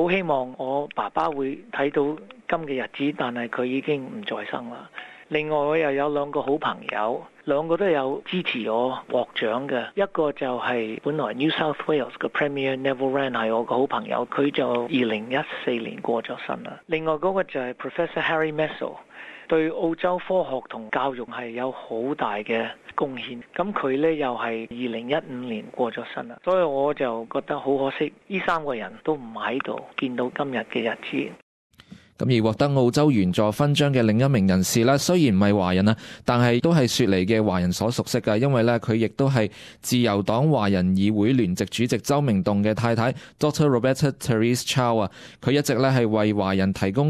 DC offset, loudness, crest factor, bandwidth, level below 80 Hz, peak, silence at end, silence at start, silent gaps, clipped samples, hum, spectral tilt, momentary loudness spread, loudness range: under 0.1%; -24 LUFS; 16 dB; 14.5 kHz; -52 dBFS; -6 dBFS; 0 s; 0 s; 31.42-31.70 s; under 0.1%; none; -6 dB/octave; 10 LU; 7 LU